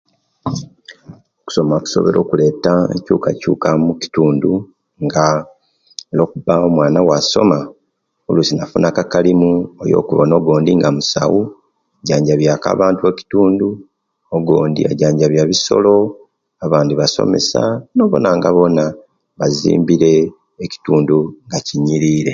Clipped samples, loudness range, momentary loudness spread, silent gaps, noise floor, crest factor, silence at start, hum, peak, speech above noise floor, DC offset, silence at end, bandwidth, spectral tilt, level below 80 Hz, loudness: under 0.1%; 2 LU; 10 LU; none; -67 dBFS; 14 dB; 0.45 s; none; 0 dBFS; 54 dB; under 0.1%; 0 s; 7.6 kHz; -6 dB/octave; -48 dBFS; -14 LUFS